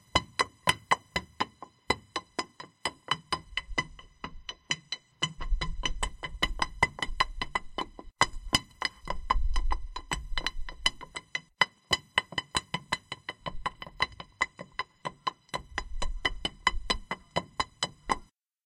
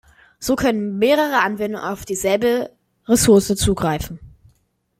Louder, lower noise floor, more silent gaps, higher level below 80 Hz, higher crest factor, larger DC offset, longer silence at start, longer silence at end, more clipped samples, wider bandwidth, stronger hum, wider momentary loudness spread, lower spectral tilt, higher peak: second, -32 LUFS vs -18 LUFS; second, -50 dBFS vs -63 dBFS; neither; about the same, -38 dBFS vs -40 dBFS; first, 26 dB vs 16 dB; neither; second, 0.15 s vs 0.4 s; second, 0.45 s vs 0.7 s; neither; about the same, 15.5 kHz vs 16.5 kHz; neither; second, 10 LU vs 15 LU; second, -2 dB/octave vs -4.5 dB/octave; second, -6 dBFS vs -2 dBFS